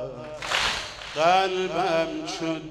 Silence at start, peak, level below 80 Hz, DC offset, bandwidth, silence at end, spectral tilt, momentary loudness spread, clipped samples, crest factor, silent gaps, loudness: 0 s; -6 dBFS; -52 dBFS; under 0.1%; 14 kHz; 0 s; -3 dB/octave; 11 LU; under 0.1%; 20 dB; none; -25 LUFS